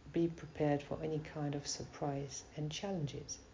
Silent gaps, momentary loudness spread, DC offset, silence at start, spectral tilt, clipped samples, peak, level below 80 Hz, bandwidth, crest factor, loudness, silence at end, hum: none; 7 LU; under 0.1%; 0 s; -5.5 dB/octave; under 0.1%; -22 dBFS; -62 dBFS; 7.6 kHz; 18 dB; -40 LUFS; 0 s; none